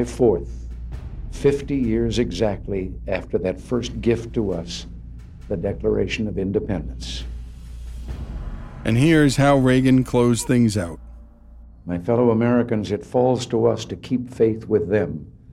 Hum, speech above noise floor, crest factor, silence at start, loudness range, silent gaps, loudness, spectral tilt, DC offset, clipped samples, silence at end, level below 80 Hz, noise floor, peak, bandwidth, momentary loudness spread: none; 24 dB; 16 dB; 0 s; 8 LU; none; -21 LUFS; -6.5 dB/octave; under 0.1%; under 0.1%; 0 s; -36 dBFS; -44 dBFS; -6 dBFS; 14 kHz; 19 LU